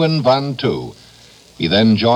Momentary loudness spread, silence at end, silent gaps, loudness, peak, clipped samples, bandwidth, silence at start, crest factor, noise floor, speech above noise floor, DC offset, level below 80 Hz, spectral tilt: 12 LU; 0 s; none; -16 LUFS; 0 dBFS; under 0.1%; 10 kHz; 0 s; 16 dB; -45 dBFS; 30 dB; under 0.1%; -50 dBFS; -7 dB/octave